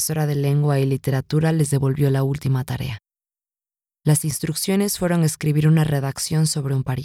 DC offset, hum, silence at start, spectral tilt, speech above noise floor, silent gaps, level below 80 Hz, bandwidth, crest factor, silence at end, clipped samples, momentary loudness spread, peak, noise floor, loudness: under 0.1%; none; 0 s; -6 dB/octave; over 70 dB; none; -48 dBFS; 16 kHz; 16 dB; 0 s; under 0.1%; 5 LU; -6 dBFS; under -90 dBFS; -20 LUFS